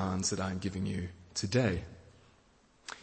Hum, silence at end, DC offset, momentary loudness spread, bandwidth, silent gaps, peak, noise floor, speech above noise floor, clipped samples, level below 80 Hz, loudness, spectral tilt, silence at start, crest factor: none; 0 s; under 0.1%; 17 LU; 8.8 kHz; none; -16 dBFS; -65 dBFS; 32 dB; under 0.1%; -56 dBFS; -34 LUFS; -4.5 dB/octave; 0 s; 18 dB